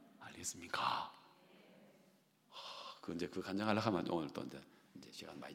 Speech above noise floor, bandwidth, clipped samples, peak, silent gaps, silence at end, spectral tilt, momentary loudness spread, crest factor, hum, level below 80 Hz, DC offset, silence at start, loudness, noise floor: 30 dB; 16.5 kHz; under 0.1%; -20 dBFS; none; 0 s; -4.5 dB/octave; 20 LU; 24 dB; none; -78 dBFS; under 0.1%; 0 s; -42 LUFS; -72 dBFS